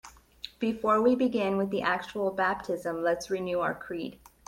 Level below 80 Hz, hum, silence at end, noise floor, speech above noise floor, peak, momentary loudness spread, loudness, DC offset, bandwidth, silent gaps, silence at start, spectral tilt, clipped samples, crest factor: -62 dBFS; none; 0.3 s; -48 dBFS; 20 dB; -12 dBFS; 13 LU; -29 LUFS; under 0.1%; 16.5 kHz; none; 0.05 s; -5.5 dB/octave; under 0.1%; 18 dB